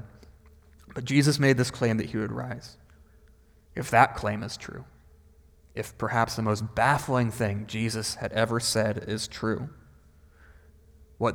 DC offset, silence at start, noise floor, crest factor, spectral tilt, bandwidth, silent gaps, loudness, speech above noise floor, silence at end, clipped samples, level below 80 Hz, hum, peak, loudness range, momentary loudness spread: under 0.1%; 0 s; -57 dBFS; 26 dB; -5 dB/octave; 19.5 kHz; none; -27 LUFS; 31 dB; 0 s; under 0.1%; -52 dBFS; none; -4 dBFS; 3 LU; 17 LU